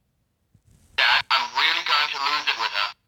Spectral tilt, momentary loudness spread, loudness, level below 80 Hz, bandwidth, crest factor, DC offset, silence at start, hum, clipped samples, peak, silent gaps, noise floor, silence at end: 0.5 dB/octave; 5 LU; -21 LUFS; -66 dBFS; 18 kHz; 20 dB; under 0.1%; 1 s; none; under 0.1%; -4 dBFS; none; -70 dBFS; 0.15 s